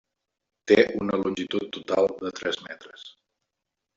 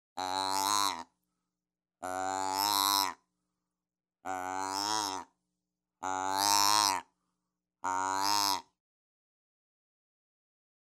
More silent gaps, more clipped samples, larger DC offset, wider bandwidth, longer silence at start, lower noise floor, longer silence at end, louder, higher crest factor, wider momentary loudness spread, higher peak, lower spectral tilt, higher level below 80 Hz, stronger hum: neither; neither; neither; second, 7.8 kHz vs 16 kHz; first, 0.65 s vs 0.15 s; second, -84 dBFS vs under -90 dBFS; second, 0.85 s vs 2.25 s; first, -25 LUFS vs -30 LUFS; about the same, 24 dB vs 26 dB; first, 22 LU vs 15 LU; first, -4 dBFS vs -8 dBFS; first, -5 dB/octave vs 0 dB/octave; first, -64 dBFS vs -84 dBFS; neither